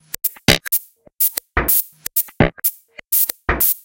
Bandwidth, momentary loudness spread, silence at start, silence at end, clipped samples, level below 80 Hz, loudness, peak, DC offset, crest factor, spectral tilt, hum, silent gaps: 17.5 kHz; 5 LU; 0.25 s; 0.05 s; under 0.1%; -34 dBFS; -17 LUFS; 0 dBFS; under 0.1%; 20 dB; -3 dB/octave; none; none